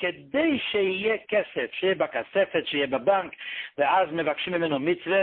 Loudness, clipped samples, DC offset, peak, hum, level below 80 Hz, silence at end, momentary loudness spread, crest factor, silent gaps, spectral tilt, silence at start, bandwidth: -26 LUFS; under 0.1%; under 0.1%; -10 dBFS; none; -66 dBFS; 0 s; 4 LU; 16 dB; none; -9 dB/octave; 0 s; 4.4 kHz